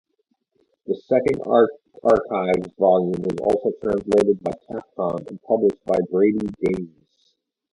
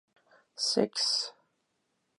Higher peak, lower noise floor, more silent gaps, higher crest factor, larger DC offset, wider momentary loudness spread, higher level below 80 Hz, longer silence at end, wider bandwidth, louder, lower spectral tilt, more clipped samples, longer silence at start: first, -2 dBFS vs -12 dBFS; second, -71 dBFS vs -78 dBFS; neither; about the same, 20 dB vs 22 dB; neither; about the same, 11 LU vs 12 LU; first, -54 dBFS vs -84 dBFS; about the same, 0.85 s vs 0.85 s; about the same, 11 kHz vs 11.5 kHz; first, -21 LUFS vs -29 LUFS; first, -8 dB/octave vs -2.5 dB/octave; neither; first, 0.9 s vs 0.55 s